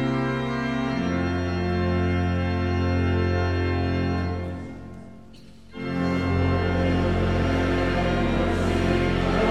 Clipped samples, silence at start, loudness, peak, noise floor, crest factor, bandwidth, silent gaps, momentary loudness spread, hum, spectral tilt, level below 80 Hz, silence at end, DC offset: under 0.1%; 0 s; -24 LUFS; -8 dBFS; -47 dBFS; 16 dB; 9.2 kHz; none; 8 LU; none; -7.5 dB/octave; -36 dBFS; 0 s; 0.4%